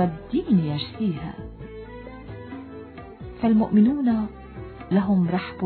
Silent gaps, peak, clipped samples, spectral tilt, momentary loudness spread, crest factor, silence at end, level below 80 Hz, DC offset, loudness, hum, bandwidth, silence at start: none; -8 dBFS; under 0.1%; -11.5 dB/octave; 21 LU; 16 dB; 0 s; -48 dBFS; under 0.1%; -23 LUFS; none; 4.5 kHz; 0 s